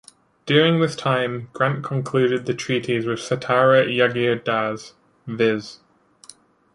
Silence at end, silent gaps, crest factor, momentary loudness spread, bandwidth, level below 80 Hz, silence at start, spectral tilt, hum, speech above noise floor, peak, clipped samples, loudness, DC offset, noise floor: 1 s; none; 20 dB; 12 LU; 11.5 kHz; -62 dBFS; 0.45 s; -5.5 dB/octave; none; 29 dB; -2 dBFS; under 0.1%; -20 LUFS; under 0.1%; -49 dBFS